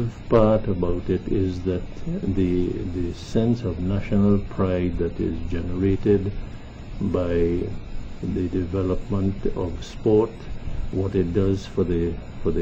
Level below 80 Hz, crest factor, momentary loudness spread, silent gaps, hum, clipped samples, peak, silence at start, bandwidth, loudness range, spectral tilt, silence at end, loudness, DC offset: -34 dBFS; 18 dB; 11 LU; none; none; under 0.1%; -6 dBFS; 0 s; 7.8 kHz; 2 LU; -9 dB/octave; 0 s; -24 LUFS; under 0.1%